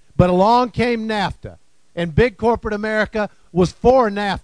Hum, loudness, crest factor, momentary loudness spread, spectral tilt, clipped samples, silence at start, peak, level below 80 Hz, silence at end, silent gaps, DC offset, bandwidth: none; -18 LUFS; 18 dB; 10 LU; -7 dB/octave; under 0.1%; 0.2 s; 0 dBFS; -36 dBFS; 0.05 s; none; 0.3%; 10.5 kHz